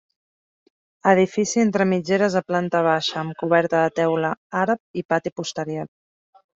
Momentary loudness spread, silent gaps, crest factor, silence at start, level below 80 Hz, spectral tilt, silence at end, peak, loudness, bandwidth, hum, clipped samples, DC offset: 10 LU; 4.37-4.50 s, 4.80-4.94 s, 5.05-5.09 s, 5.32-5.36 s; 18 dB; 1.05 s; -64 dBFS; -5 dB/octave; 0.7 s; -4 dBFS; -21 LUFS; 7.8 kHz; none; under 0.1%; under 0.1%